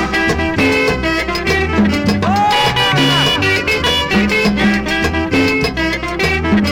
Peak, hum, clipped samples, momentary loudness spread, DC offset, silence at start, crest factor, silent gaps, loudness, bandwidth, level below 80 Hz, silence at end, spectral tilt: -2 dBFS; none; under 0.1%; 4 LU; under 0.1%; 0 s; 12 dB; none; -13 LUFS; 16.5 kHz; -30 dBFS; 0 s; -4.5 dB/octave